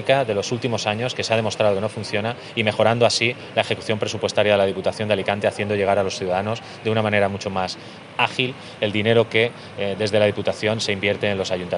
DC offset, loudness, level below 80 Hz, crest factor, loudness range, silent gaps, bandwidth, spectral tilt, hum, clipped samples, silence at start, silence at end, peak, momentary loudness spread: under 0.1%; -21 LUFS; -64 dBFS; 18 dB; 2 LU; none; 11 kHz; -4.5 dB/octave; none; under 0.1%; 0 s; 0 s; -2 dBFS; 7 LU